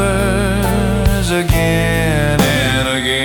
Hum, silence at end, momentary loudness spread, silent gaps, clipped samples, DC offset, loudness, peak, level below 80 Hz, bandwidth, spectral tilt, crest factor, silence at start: none; 0 s; 2 LU; none; under 0.1%; under 0.1%; -14 LUFS; -2 dBFS; -22 dBFS; 19 kHz; -5 dB/octave; 12 dB; 0 s